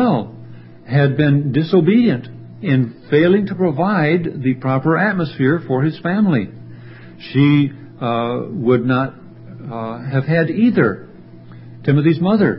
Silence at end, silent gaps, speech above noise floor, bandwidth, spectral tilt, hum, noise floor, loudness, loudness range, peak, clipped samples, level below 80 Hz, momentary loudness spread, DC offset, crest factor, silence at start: 0 s; none; 23 dB; 5.8 kHz; -13 dB/octave; none; -38 dBFS; -17 LUFS; 3 LU; -2 dBFS; under 0.1%; -54 dBFS; 13 LU; under 0.1%; 16 dB; 0 s